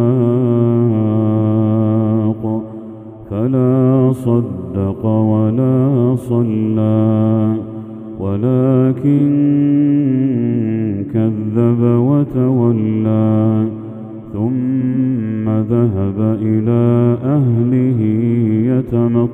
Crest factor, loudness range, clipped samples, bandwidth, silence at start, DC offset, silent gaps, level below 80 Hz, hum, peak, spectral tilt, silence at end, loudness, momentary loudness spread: 14 dB; 2 LU; under 0.1%; 3.6 kHz; 0 s; under 0.1%; none; -50 dBFS; none; 0 dBFS; -11.5 dB/octave; 0 s; -15 LUFS; 8 LU